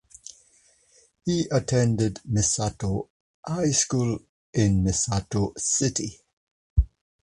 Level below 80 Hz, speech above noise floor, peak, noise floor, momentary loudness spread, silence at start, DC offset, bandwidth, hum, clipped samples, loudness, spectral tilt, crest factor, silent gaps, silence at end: -36 dBFS; 37 dB; -8 dBFS; -61 dBFS; 12 LU; 1.25 s; under 0.1%; 11.5 kHz; none; under 0.1%; -25 LUFS; -5 dB/octave; 18 dB; 3.10-3.43 s, 4.29-4.53 s, 6.33-6.76 s; 0.45 s